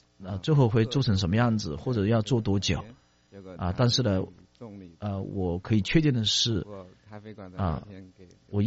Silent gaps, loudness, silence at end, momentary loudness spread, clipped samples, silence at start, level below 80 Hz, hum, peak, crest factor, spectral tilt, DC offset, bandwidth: none; -27 LUFS; 0 s; 22 LU; under 0.1%; 0.2 s; -48 dBFS; none; -10 dBFS; 18 dB; -5.5 dB/octave; under 0.1%; 8 kHz